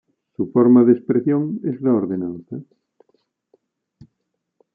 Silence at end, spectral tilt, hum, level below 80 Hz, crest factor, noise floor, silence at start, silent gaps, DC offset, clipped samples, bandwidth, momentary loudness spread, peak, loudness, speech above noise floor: 2.15 s; -13.5 dB/octave; none; -70 dBFS; 18 dB; -76 dBFS; 0.4 s; none; under 0.1%; under 0.1%; 2.5 kHz; 21 LU; -4 dBFS; -18 LUFS; 59 dB